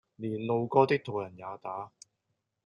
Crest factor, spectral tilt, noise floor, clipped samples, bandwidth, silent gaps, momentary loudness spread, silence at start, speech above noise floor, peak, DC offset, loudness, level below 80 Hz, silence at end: 24 dB; -7.5 dB/octave; -82 dBFS; under 0.1%; 11 kHz; none; 16 LU; 0.2 s; 51 dB; -8 dBFS; under 0.1%; -30 LUFS; -76 dBFS; 0.75 s